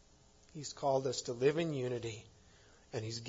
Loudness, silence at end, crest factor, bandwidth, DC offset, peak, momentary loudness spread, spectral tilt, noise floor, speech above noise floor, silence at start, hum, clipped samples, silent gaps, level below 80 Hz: -37 LUFS; 0 s; 20 dB; 7.4 kHz; under 0.1%; -18 dBFS; 14 LU; -5 dB/octave; -64 dBFS; 28 dB; 0.55 s; none; under 0.1%; none; -70 dBFS